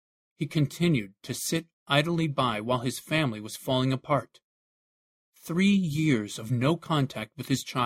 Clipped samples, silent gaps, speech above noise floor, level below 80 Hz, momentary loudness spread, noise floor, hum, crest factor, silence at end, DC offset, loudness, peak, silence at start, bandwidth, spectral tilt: under 0.1%; 1.73-1.86 s, 4.44-5.33 s; over 63 dB; -62 dBFS; 8 LU; under -90 dBFS; none; 20 dB; 0 s; under 0.1%; -28 LUFS; -8 dBFS; 0.4 s; 16 kHz; -5.5 dB/octave